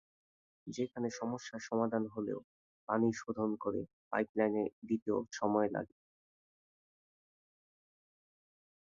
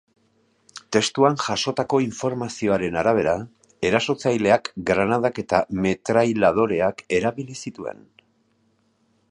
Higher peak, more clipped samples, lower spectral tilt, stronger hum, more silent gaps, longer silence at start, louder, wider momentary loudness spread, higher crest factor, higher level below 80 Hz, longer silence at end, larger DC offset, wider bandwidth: second, -18 dBFS vs -2 dBFS; neither; about the same, -6 dB/octave vs -5 dB/octave; neither; first, 2.44-2.87 s, 3.93-4.11 s, 4.29-4.34 s, 4.73-4.82 s, 5.02-5.06 s vs none; about the same, 0.65 s vs 0.75 s; second, -37 LUFS vs -22 LUFS; second, 9 LU vs 13 LU; about the same, 20 dB vs 20 dB; second, -76 dBFS vs -52 dBFS; first, 3.05 s vs 1.4 s; neither; second, 7.4 kHz vs 11 kHz